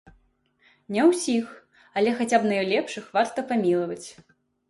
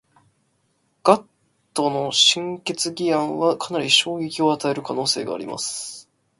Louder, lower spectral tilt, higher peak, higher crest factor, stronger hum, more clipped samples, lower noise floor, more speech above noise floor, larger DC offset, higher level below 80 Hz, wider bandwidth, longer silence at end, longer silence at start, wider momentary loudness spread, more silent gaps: second, -24 LUFS vs -21 LUFS; first, -4.5 dB/octave vs -2.5 dB/octave; second, -8 dBFS vs 0 dBFS; about the same, 18 dB vs 22 dB; neither; neither; about the same, -65 dBFS vs -67 dBFS; second, 41 dB vs 46 dB; neither; about the same, -68 dBFS vs -68 dBFS; about the same, 11.5 kHz vs 11.5 kHz; first, 0.55 s vs 0.4 s; second, 0.9 s vs 1.05 s; about the same, 12 LU vs 12 LU; neither